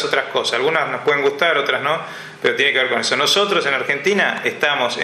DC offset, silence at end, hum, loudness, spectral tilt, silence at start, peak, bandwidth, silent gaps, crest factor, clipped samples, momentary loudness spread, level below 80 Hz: under 0.1%; 0 s; none; -17 LUFS; -2.5 dB/octave; 0 s; 0 dBFS; 14.5 kHz; none; 18 dB; under 0.1%; 5 LU; -70 dBFS